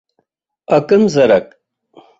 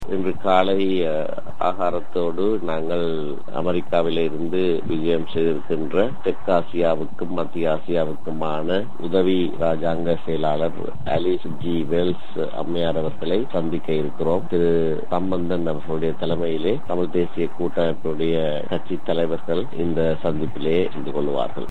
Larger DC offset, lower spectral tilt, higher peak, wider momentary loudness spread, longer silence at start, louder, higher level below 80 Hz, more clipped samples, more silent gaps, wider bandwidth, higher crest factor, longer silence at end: second, under 0.1% vs 10%; second, -6.5 dB/octave vs -8 dB/octave; about the same, -2 dBFS vs -2 dBFS; about the same, 5 LU vs 5 LU; first, 0.7 s vs 0 s; first, -13 LUFS vs -23 LUFS; about the same, -54 dBFS vs -52 dBFS; neither; neither; second, 8 kHz vs 9 kHz; second, 14 dB vs 20 dB; first, 0.75 s vs 0 s